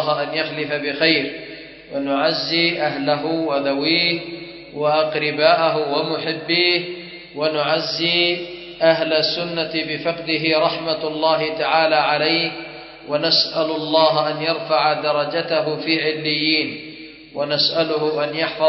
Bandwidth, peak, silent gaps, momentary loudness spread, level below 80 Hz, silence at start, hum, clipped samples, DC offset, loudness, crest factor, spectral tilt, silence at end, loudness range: 6 kHz; 0 dBFS; none; 12 LU; -60 dBFS; 0 s; none; under 0.1%; under 0.1%; -19 LUFS; 20 dB; -5.5 dB/octave; 0 s; 2 LU